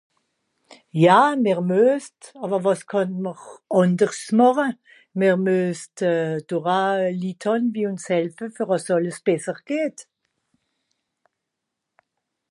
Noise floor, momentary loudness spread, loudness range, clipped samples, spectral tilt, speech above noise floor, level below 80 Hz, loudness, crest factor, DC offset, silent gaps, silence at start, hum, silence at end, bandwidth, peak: -82 dBFS; 12 LU; 6 LU; under 0.1%; -6 dB/octave; 61 dB; -76 dBFS; -21 LUFS; 20 dB; under 0.1%; none; 0.95 s; none; 2.5 s; 11.5 kHz; -2 dBFS